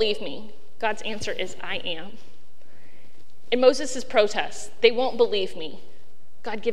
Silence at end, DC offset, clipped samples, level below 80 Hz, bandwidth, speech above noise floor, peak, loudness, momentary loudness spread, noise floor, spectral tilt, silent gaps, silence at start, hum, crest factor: 0 s; 5%; under 0.1%; -62 dBFS; 12 kHz; 34 dB; 0 dBFS; -25 LUFS; 16 LU; -59 dBFS; -3 dB/octave; none; 0 s; none; 26 dB